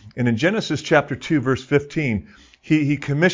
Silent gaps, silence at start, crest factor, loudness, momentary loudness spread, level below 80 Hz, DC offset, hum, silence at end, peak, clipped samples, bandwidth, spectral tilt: none; 0.05 s; 18 dB; -21 LUFS; 5 LU; -48 dBFS; under 0.1%; none; 0 s; -2 dBFS; under 0.1%; 7.6 kHz; -6.5 dB/octave